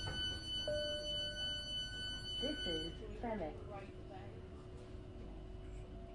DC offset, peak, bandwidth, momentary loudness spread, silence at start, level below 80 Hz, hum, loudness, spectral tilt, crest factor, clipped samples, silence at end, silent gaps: under 0.1%; -28 dBFS; 11 kHz; 13 LU; 0 s; -54 dBFS; none; -43 LUFS; -4 dB/octave; 16 dB; under 0.1%; 0 s; none